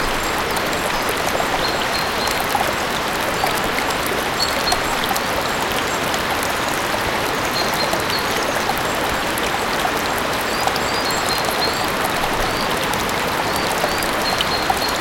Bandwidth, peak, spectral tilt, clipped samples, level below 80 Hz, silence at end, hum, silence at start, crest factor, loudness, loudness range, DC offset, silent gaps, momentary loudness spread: 17 kHz; -2 dBFS; -2.5 dB/octave; under 0.1%; -38 dBFS; 0 s; none; 0 s; 18 dB; -19 LUFS; 0 LU; under 0.1%; none; 2 LU